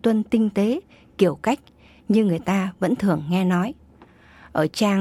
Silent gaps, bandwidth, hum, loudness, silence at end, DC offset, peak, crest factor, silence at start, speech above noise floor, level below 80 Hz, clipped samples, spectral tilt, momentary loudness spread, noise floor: none; 14.5 kHz; none; -22 LUFS; 0 s; under 0.1%; -6 dBFS; 16 dB; 0.05 s; 30 dB; -56 dBFS; under 0.1%; -7 dB/octave; 9 LU; -50 dBFS